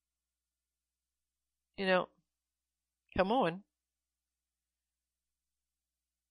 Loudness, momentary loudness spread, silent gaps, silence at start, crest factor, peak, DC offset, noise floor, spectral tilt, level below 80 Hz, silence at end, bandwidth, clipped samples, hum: -33 LUFS; 14 LU; none; 1.8 s; 26 dB; -14 dBFS; under 0.1%; under -90 dBFS; -7 dB/octave; -66 dBFS; 2.7 s; 10 kHz; under 0.1%; none